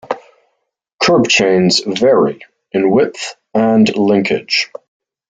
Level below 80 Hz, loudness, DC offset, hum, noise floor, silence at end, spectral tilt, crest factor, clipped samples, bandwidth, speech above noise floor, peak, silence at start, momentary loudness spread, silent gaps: -54 dBFS; -13 LUFS; under 0.1%; none; -70 dBFS; 0.65 s; -4.5 dB/octave; 14 dB; under 0.1%; 9.2 kHz; 58 dB; 0 dBFS; 0.1 s; 13 LU; 0.93-0.98 s